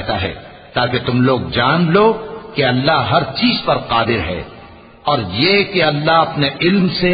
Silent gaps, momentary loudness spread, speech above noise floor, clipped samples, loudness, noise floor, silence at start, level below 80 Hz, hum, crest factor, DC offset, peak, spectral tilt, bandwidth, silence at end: none; 11 LU; 24 dB; under 0.1%; -15 LUFS; -39 dBFS; 0 s; -40 dBFS; none; 16 dB; under 0.1%; 0 dBFS; -11 dB/octave; 5 kHz; 0 s